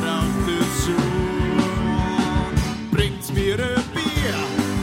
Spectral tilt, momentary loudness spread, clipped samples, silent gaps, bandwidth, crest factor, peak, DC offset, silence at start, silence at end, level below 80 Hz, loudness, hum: -5.5 dB/octave; 2 LU; under 0.1%; none; 16.5 kHz; 18 dB; -4 dBFS; under 0.1%; 0 s; 0 s; -32 dBFS; -22 LUFS; none